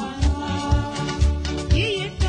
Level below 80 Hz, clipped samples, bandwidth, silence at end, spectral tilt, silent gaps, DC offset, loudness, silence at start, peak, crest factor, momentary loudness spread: -24 dBFS; under 0.1%; 10 kHz; 0 s; -5.5 dB/octave; none; under 0.1%; -23 LUFS; 0 s; -6 dBFS; 16 dB; 5 LU